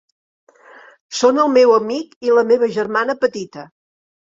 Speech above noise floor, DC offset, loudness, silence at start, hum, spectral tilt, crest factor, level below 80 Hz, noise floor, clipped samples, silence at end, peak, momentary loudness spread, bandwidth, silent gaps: 29 dB; under 0.1%; -16 LUFS; 1.1 s; none; -4 dB/octave; 16 dB; -66 dBFS; -45 dBFS; under 0.1%; 0.7 s; -2 dBFS; 16 LU; 7.8 kHz; 2.16-2.21 s